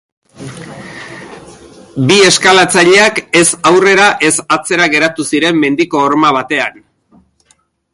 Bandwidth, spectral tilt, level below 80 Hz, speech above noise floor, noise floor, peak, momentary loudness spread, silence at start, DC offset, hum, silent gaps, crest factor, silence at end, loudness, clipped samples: 11.5 kHz; -3 dB/octave; -52 dBFS; 45 dB; -54 dBFS; 0 dBFS; 21 LU; 0.4 s; under 0.1%; none; none; 12 dB; 1.25 s; -9 LUFS; under 0.1%